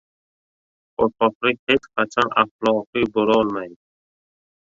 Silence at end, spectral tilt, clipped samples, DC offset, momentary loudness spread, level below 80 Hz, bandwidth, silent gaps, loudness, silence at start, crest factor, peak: 0.95 s; -5.5 dB/octave; under 0.1%; under 0.1%; 6 LU; -58 dBFS; 7.6 kHz; 1.35-1.41 s, 1.59-1.67 s, 2.51-2.59 s, 2.87-2.93 s; -20 LUFS; 1 s; 20 dB; -2 dBFS